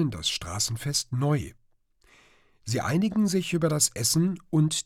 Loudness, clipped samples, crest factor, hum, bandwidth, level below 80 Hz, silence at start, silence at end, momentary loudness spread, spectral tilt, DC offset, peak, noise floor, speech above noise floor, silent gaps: -26 LUFS; under 0.1%; 16 dB; none; 16.5 kHz; -54 dBFS; 0 s; 0.05 s; 7 LU; -4.5 dB/octave; under 0.1%; -10 dBFS; -63 dBFS; 38 dB; none